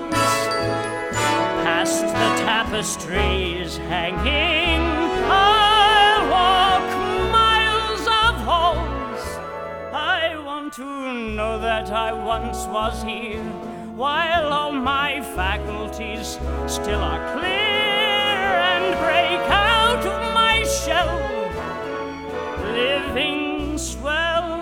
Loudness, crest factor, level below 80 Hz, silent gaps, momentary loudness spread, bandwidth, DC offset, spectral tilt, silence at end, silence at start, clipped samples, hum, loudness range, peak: -20 LUFS; 16 dB; -34 dBFS; none; 13 LU; 17.5 kHz; under 0.1%; -3.5 dB/octave; 0 s; 0 s; under 0.1%; none; 8 LU; -4 dBFS